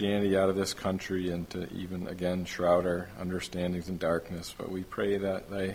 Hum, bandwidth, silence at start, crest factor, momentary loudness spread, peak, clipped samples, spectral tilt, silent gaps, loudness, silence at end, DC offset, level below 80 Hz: none; 16.5 kHz; 0 s; 20 dB; 11 LU; -12 dBFS; under 0.1%; -5.5 dB/octave; none; -32 LUFS; 0 s; under 0.1%; -54 dBFS